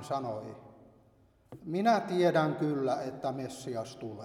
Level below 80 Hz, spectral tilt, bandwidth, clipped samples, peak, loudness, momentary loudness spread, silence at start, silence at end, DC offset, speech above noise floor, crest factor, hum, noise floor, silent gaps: -72 dBFS; -6.5 dB/octave; 13.5 kHz; under 0.1%; -12 dBFS; -32 LUFS; 15 LU; 0 s; 0 s; under 0.1%; 33 dB; 20 dB; none; -64 dBFS; none